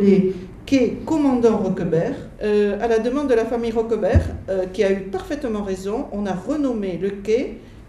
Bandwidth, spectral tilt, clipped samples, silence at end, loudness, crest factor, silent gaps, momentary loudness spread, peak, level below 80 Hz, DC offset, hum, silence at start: 12 kHz; -7.5 dB/octave; under 0.1%; 0 s; -21 LUFS; 16 dB; none; 7 LU; -4 dBFS; -36 dBFS; under 0.1%; none; 0 s